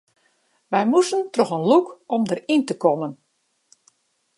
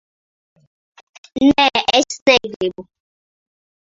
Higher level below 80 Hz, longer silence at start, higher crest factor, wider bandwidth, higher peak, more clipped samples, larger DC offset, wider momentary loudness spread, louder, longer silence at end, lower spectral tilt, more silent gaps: second, -76 dBFS vs -52 dBFS; second, 0.7 s vs 1.35 s; about the same, 20 dB vs 20 dB; first, 11.5 kHz vs 7.8 kHz; about the same, -2 dBFS vs 0 dBFS; neither; neither; second, 7 LU vs 11 LU; second, -21 LUFS vs -15 LUFS; about the same, 1.25 s vs 1.15 s; first, -5.5 dB/octave vs -3 dB/octave; second, none vs 2.22-2.26 s, 2.56-2.60 s